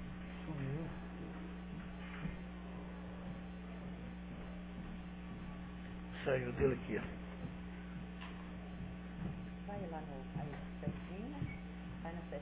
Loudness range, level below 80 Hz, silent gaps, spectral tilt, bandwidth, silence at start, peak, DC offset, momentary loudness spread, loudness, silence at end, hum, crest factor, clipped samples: 6 LU; -54 dBFS; none; -6.5 dB/octave; 4 kHz; 0 s; -22 dBFS; under 0.1%; 10 LU; -45 LUFS; 0 s; 60 Hz at -50 dBFS; 22 dB; under 0.1%